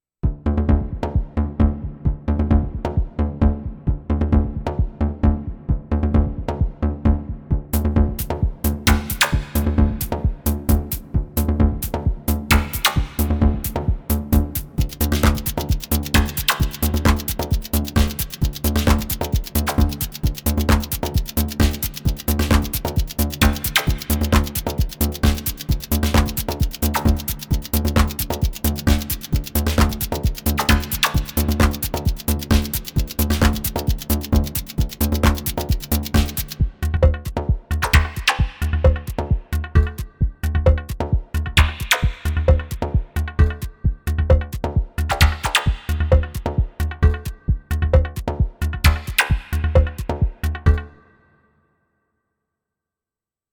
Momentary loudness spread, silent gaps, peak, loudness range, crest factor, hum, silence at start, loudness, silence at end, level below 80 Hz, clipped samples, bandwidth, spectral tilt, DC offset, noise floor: 6 LU; none; -2 dBFS; 2 LU; 18 dB; none; 0.25 s; -21 LUFS; 2.65 s; -24 dBFS; under 0.1%; over 20 kHz; -5 dB/octave; under 0.1%; -90 dBFS